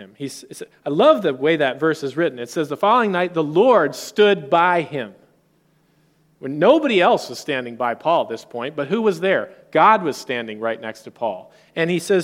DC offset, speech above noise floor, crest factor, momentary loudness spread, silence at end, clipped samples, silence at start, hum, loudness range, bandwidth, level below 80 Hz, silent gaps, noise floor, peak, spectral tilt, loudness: under 0.1%; 42 dB; 18 dB; 16 LU; 0 s; under 0.1%; 0 s; none; 3 LU; 16 kHz; -70 dBFS; none; -60 dBFS; 0 dBFS; -5 dB/octave; -19 LUFS